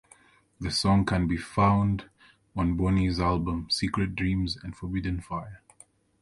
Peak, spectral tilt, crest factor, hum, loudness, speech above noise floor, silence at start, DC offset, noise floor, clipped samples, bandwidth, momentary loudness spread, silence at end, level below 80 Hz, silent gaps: -10 dBFS; -6 dB/octave; 18 dB; none; -27 LUFS; 32 dB; 0.6 s; under 0.1%; -59 dBFS; under 0.1%; 11.5 kHz; 12 LU; 0.65 s; -40 dBFS; none